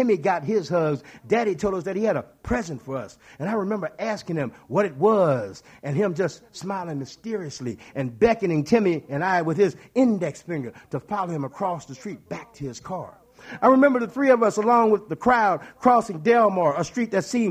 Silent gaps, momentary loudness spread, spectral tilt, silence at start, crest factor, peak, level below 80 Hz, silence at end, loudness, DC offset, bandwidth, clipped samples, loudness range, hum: none; 15 LU; -6.5 dB/octave; 0 s; 18 dB; -4 dBFS; -54 dBFS; 0 s; -23 LUFS; under 0.1%; 14.5 kHz; under 0.1%; 7 LU; none